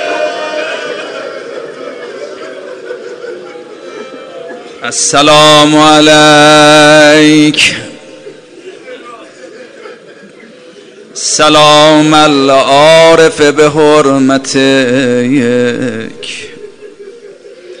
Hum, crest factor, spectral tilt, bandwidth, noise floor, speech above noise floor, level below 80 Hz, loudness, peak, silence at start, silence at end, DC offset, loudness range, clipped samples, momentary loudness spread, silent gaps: none; 8 dB; -3.5 dB/octave; 16 kHz; -34 dBFS; 29 dB; -46 dBFS; -5 LUFS; 0 dBFS; 0 s; 0.05 s; under 0.1%; 18 LU; 2%; 23 LU; none